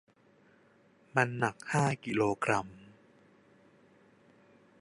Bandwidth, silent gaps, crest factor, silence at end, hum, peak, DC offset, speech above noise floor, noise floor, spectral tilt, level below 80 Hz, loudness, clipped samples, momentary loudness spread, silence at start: 11.5 kHz; none; 26 dB; 1.95 s; none; -10 dBFS; under 0.1%; 34 dB; -64 dBFS; -5.5 dB/octave; -70 dBFS; -31 LUFS; under 0.1%; 5 LU; 1.15 s